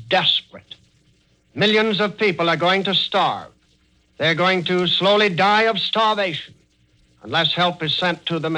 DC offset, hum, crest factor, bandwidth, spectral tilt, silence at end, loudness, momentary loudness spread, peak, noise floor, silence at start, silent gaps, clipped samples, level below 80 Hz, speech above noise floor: under 0.1%; none; 16 dB; 10.5 kHz; -5 dB/octave; 0 s; -18 LUFS; 7 LU; -4 dBFS; -59 dBFS; 0 s; none; under 0.1%; -62 dBFS; 41 dB